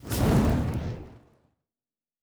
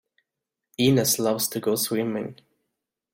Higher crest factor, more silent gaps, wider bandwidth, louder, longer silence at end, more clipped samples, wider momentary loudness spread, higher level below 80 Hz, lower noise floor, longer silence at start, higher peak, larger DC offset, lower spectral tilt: about the same, 18 dB vs 18 dB; neither; first, over 20 kHz vs 16.5 kHz; second, -26 LUFS vs -23 LUFS; first, 1.1 s vs 0.8 s; neither; about the same, 15 LU vs 13 LU; first, -36 dBFS vs -62 dBFS; first, under -90 dBFS vs -86 dBFS; second, 0.05 s vs 0.8 s; about the same, -10 dBFS vs -8 dBFS; neither; first, -6.5 dB/octave vs -4 dB/octave